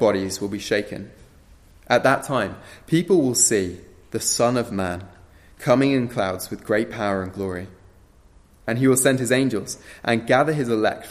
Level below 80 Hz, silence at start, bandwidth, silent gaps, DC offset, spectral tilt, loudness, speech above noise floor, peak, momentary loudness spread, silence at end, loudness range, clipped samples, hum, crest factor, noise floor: -54 dBFS; 0 s; 15 kHz; none; under 0.1%; -4 dB/octave; -21 LUFS; 31 dB; -4 dBFS; 16 LU; 0 s; 3 LU; under 0.1%; none; 18 dB; -52 dBFS